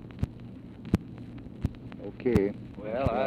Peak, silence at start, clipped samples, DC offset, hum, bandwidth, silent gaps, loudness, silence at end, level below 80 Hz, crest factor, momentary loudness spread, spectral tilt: -10 dBFS; 0 s; under 0.1%; under 0.1%; none; 15.5 kHz; none; -32 LUFS; 0 s; -44 dBFS; 22 dB; 17 LU; -8.5 dB/octave